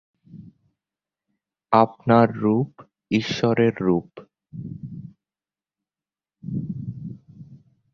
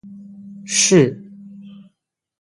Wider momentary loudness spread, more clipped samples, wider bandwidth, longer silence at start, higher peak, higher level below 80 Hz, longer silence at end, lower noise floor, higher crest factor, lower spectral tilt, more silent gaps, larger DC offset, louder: second, 21 LU vs 26 LU; neither; second, 7.2 kHz vs 11.5 kHz; first, 0.35 s vs 0.05 s; about the same, -2 dBFS vs 0 dBFS; about the same, -58 dBFS vs -60 dBFS; second, 0.35 s vs 0.75 s; first, under -90 dBFS vs -72 dBFS; about the same, 24 dB vs 20 dB; first, -7.5 dB/octave vs -3.5 dB/octave; neither; neither; second, -22 LUFS vs -15 LUFS